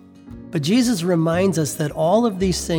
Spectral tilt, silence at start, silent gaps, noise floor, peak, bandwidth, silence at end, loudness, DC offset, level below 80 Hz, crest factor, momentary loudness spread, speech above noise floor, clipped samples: -5.5 dB/octave; 0.25 s; none; -39 dBFS; -6 dBFS; 19.5 kHz; 0 s; -19 LUFS; under 0.1%; -42 dBFS; 14 dB; 7 LU; 21 dB; under 0.1%